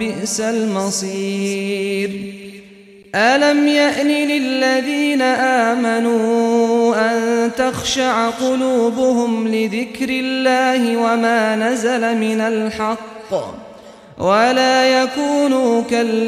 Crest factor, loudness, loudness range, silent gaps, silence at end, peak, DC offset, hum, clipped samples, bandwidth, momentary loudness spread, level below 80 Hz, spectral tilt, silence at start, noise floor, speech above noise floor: 14 dB; -16 LUFS; 3 LU; none; 0 s; -2 dBFS; under 0.1%; none; under 0.1%; 14.5 kHz; 9 LU; -54 dBFS; -4 dB/octave; 0 s; -42 dBFS; 26 dB